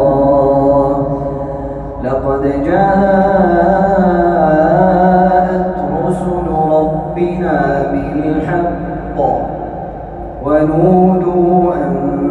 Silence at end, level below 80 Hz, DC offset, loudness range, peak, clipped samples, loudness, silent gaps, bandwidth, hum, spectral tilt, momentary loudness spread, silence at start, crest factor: 0 s; -30 dBFS; under 0.1%; 5 LU; 0 dBFS; under 0.1%; -13 LUFS; none; 9.4 kHz; none; -10 dB/octave; 11 LU; 0 s; 12 dB